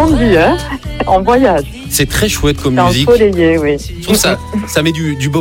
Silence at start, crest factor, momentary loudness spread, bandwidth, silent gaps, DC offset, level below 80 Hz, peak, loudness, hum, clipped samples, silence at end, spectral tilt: 0 s; 10 dB; 8 LU; 17 kHz; none; under 0.1%; -26 dBFS; 0 dBFS; -12 LUFS; none; under 0.1%; 0 s; -4.5 dB/octave